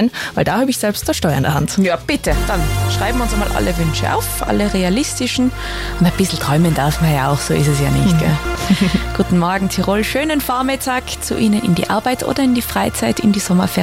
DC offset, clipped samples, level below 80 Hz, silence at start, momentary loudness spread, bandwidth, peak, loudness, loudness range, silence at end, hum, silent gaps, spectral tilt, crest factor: under 0.1%; under 0.1%; -28 dBFS; 0 s; 3 LU; 16.5 kHz; -2 dBFS; -16 LUFS; 2 LU; 0 s; none; none; -5 dB/octave; 14 dB